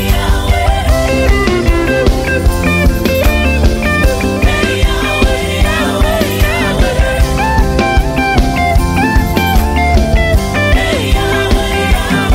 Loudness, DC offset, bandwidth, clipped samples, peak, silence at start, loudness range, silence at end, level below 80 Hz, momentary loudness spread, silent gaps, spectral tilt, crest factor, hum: -12 LUFS; under 0.1%; 16.5 kHz; under 0.1%; 0 dBFS; 0 s; 1 LU; 0 s; -14 dBFS; 1 LU; none; -5.5 dB/octave; 10 dB; none